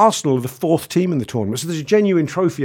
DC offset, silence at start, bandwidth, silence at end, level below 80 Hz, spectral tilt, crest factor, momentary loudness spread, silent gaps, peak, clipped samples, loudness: under 0.1%; 0 s; 18 kHz; 0 s; -58 dBFS; -6 dB/octave; 16 dB; 7 LU; none; 0 dBFS; under 0.1%; -19 LUFS